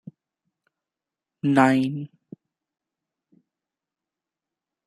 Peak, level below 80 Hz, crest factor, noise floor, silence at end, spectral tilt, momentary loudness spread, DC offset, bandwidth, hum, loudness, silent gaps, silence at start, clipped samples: -2 dBFS; -72 dBFS; 26 dB; -89 dBFS; 2.8 s; -7 dB/octave; 18 LU; under 0.1%; 11.5 kHz; none; -21 LUFS; none; 1.45 s; under 0.1%